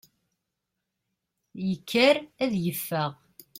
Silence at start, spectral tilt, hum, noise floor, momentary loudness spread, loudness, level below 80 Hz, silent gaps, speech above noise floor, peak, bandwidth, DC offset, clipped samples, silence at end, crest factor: 1.55 s; -5 dB/octave; none; -83 dBFS; 11 LU; -26 LUFS; -68 dBFS; none; 58 dB; -8 dBFS; 16.5 kHz; under 0.1%; under 0.1%; 0.45 s; 20 dB